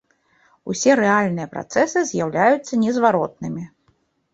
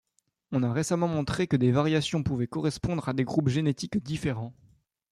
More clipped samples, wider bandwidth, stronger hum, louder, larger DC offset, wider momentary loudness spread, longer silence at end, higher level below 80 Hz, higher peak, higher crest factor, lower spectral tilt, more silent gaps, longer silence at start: neither; second, 8.2 kHz vs 12.5 kHz; neither; first, -19 LUFS vs -28 LUFS; neither; first, 14 LU vs 7 LU; about the same, 0.65 s vs 0.6 s; second, -62 dBFS vs -54 dBFS; first, -2 dBFS vs -12 dBFS; about the same, 18 dB vs 16 dB; second, -5 dB/octave vs -6.5 dB/octave; neither; first, 0.65 s vs 0.5 s